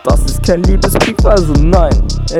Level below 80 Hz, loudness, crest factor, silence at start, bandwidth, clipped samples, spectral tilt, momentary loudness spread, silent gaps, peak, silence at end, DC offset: -12 dBFS; -11 LUFS; 10 dB; 0.05 s; 15 kHz; 0.3%; -6 dB/octave; 4 LU; none; 0 dBFS; 0 s; under 0.1%